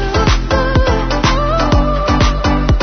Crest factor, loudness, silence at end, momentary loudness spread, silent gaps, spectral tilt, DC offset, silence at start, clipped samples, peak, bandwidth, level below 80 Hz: 12 dB; -14 LUFS; 0 s; 1 LU; none; -6 dB/octave; under 0.1%; 0 s; under 0.1%; 0 dBFS; 6.6 kHz; -16 dBFS